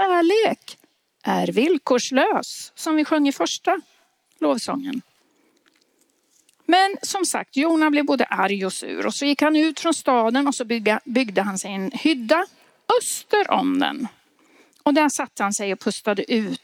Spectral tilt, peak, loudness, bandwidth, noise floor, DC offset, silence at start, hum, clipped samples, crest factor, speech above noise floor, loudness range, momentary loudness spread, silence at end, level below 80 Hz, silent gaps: -3.5 dB/octave; -4 dBFS; -21 LUFS; 17 kHz; -65 dBFS; under 0.1%; 0 s; none; under 0.1%; 18 dB; 44 dB; 4 LU; 9 LU; 0.1 s; -74 dBFS; none